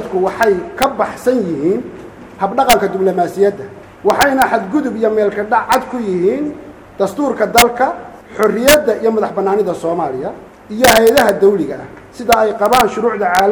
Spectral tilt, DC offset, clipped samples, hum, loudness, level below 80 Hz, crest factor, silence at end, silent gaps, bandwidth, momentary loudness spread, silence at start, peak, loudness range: -3.5 dB/octave; under 0.1%; under 0.1%; none; -14 LUFS; -42 dBFS; 14 dB; 0 s; none; over 20 kHz; 14 LU; 0 s; 0 dBFS; 3 LU